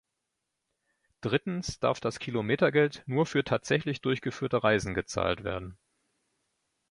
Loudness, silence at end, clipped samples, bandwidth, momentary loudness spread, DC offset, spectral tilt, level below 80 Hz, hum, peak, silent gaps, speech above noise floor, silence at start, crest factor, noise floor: -29 LUFS; 1.15 s; under 0.1%; 11.5 kHz; 8 LU; under 0.1%; -5.5 dB/octave; -56 dBFS; none; -10 dBFS; none; 55 dB; 1.25 s; 20 dB; -84 dBFS